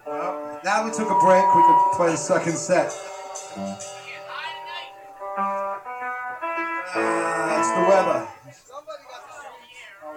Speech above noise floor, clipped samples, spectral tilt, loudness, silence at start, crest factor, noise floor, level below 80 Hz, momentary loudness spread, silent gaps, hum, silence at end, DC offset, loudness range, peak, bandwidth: 25 dB; under 0.1%; -4 dB/octave; -22 LUFS; 0.05 s; 18 dB; -44 dBFS; -68 dBFS; 24 LU; none; none; 0 s; under 0.1%; 11 LU; -6 dBFS; 15.5 kHz